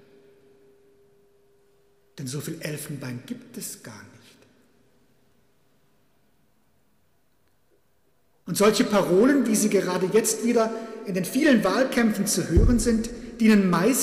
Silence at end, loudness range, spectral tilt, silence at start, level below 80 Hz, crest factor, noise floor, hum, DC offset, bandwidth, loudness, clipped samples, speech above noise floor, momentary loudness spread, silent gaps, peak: 0 s; 18 LU; -5 dB/octave; 2.15 s; -36 dBFS; 18 dB; -69 dBFS; none; under 0.1%; 15.5 kHz; -23 LUFS; under 0.1%; 47 dB; 16 LU; none; -6 dBFS